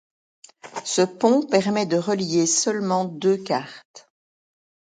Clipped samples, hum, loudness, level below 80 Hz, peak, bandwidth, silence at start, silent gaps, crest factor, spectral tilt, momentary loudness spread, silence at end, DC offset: under 0.1%; none; -21 LUFS; -70 dBFS; -4 dBFS; 9.6 kHz; 0.65 s; 3.85-3.94 s; 20 dB; -4 dB/octave; 8 LU; 0.95 s; under 0.1%